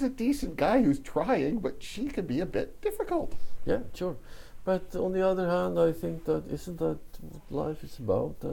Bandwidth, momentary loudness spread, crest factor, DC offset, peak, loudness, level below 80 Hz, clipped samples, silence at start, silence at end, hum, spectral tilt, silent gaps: 17 kHz; 12 LU; 18 dB; under 0.1%; -12 dBFS; -30 LUFS; -46 dBFS; under 0.1%; 0 s; 0 s; none; -7 dB/octave; none